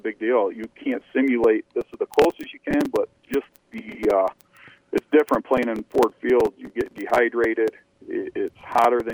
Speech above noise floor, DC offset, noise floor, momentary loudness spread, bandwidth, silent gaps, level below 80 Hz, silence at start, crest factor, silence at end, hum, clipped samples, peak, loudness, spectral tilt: 29 dB; under 0.1%; -51 dBFS; 11 LU; over 20 kHz; none; -54 dBFS; 0.05 s; 18 dB; 0 s; none; under 0.1%; -4 dBFS; -23 LUFS; -5.5 dB/octave